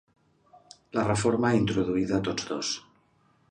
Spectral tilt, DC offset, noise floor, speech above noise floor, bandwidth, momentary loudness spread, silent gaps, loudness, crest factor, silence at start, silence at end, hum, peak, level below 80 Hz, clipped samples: -5 dB/octave; under 0.1%; -65 dBFS; 39 dB; 10.5 kHz; 8 LU; none; -27 LUFS; 18 dB; 0.95 s; 0.7 s; none; -10 dBFS; -56 dBFS; under 0.1%